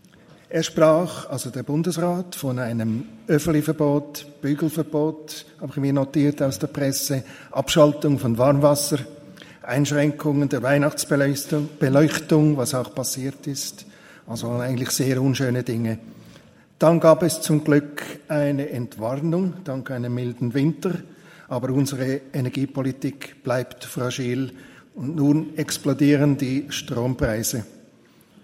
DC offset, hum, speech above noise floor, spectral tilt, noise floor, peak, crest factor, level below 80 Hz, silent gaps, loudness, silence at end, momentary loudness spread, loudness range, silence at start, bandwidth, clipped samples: under 0.1%; none; 32 dB; -5.5 dB/octave; -54 dBFS; 0 dBFS; 22 dB; -54 dBFS; none; -22 LUFS; 0.75 s; 12 LU; 5 LU; 0.5 s; 16 kHz; under 0.1%